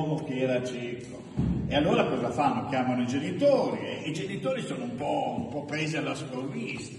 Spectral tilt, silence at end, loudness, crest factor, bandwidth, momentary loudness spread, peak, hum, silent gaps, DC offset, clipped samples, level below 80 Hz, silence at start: -6 dB/octave; 0 s; -29 LUFS; 18 dB; 11.5 kHz; 10 LU; -10 dBFS; none; none; under 0.1%; under 0.1%; -50 dBFS; 0 s